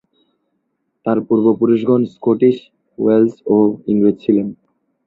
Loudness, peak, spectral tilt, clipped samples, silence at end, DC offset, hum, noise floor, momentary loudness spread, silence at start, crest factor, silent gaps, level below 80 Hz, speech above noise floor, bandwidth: -15 LUFS; -2 dBFS; -10 dB/octave; under 0.1%; 0.55 s; under 0.1%; none; -70 dBFS; 6 LU; 1.05 s; 14 dB; none; -58 dBFS; 55 dB; 4.6 kHz